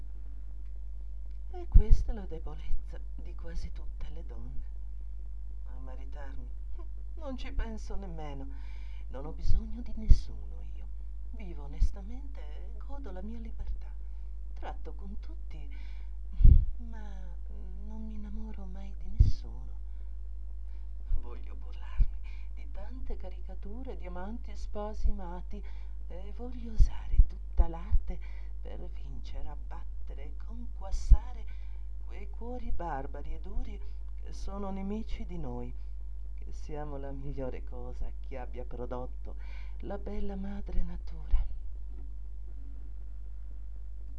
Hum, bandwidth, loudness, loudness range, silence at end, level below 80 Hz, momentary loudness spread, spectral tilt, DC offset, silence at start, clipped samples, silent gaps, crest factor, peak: none; 6.2 kHz; -38 LUFS; 10 LU; 0 s; -32 dBFS; 14 LU; -8 dB/octave; 1%; 0 s; under 0.1%; none; 26 dB; -4 dBFS